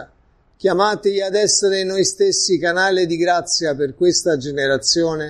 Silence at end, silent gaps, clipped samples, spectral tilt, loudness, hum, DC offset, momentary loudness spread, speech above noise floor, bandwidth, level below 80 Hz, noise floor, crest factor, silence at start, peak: 0 s; none; under 0.1%; -2.5 dB/octave; -17 LUFS; none; under 0.1%; 4 LU; 39 dB; 12 kHz; -52 dBFS; -56 dBFS; 16 dB; 0 s; -2 dBFS